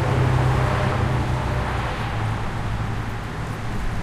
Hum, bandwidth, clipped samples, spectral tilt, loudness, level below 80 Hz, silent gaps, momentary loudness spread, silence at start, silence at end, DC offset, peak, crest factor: none; 13 kHz; under 0.1%; -6.5 dB/octave; -24 LUFS; -30 dBFS; none; 9 LU; 0 s; 0 s; under 0.1%; -8 dBFS; 14 dB